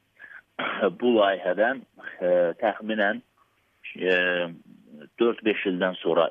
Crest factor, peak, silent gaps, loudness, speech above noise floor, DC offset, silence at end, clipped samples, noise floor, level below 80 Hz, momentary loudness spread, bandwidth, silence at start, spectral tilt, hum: 18 dB; -8 dBFS; none; -25 LUFS; 42 dB; under 0.1%; 0 s; under 0.1%; -66 dBFS; -76 dBFS; 13 LU; 5.2 kHz; 0.2 s; -7.5 dB/octave; none